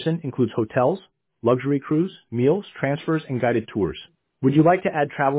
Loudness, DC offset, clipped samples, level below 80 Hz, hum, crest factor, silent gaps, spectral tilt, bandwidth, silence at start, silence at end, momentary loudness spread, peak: -22 LUFS; under 0.1%; under 0.1%; -54 dBFS; none; 16 dB; none; -11.5 dB/octave; 4 kHz; 0 s; 0 s; 8 LU; -6 dBFS